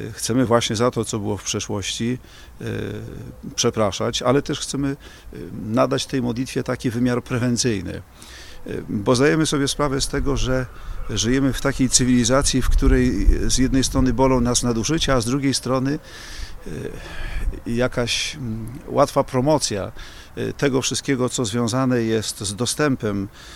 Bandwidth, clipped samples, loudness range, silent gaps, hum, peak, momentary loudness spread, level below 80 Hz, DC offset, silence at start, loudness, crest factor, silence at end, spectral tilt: 16 kHz; under 0.1%; 5 LU; none; none; 0 dBFS; 15 LU; -30 dBFS; under 0.1%; 0 s; -21 LUFS; 20 dB; 0 s; -4.5 dB/octave